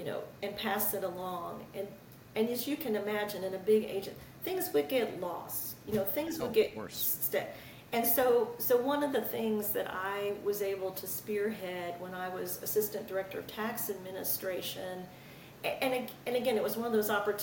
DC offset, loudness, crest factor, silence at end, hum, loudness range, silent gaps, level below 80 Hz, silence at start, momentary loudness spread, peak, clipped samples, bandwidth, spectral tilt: under 0.1%; -33 LUFS; 18 dB; 0 s; none; 5 LU; none; -68 dBFS; 0 s; 11 LU; -16 dBFS; under 0.1%; 17 kHz; -3.5 dB/octave